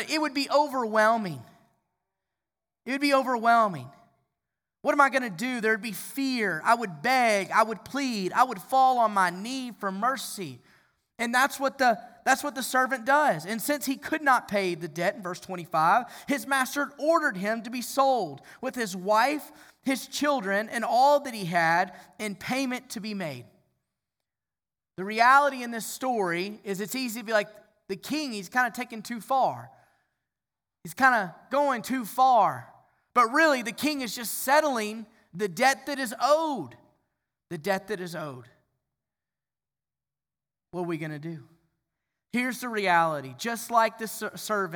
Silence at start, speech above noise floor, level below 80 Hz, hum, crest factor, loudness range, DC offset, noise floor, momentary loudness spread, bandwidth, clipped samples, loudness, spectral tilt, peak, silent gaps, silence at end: 0 s; over 64 dB; -76 dBFS; none; 22 dB; 7 LU; under 0.1%; under -90 dBFS; 14 LU; over 20 kHz; under 0.1%; -26 LUFS; -3.5 dB/octave; -6 dBFS; none; 0 s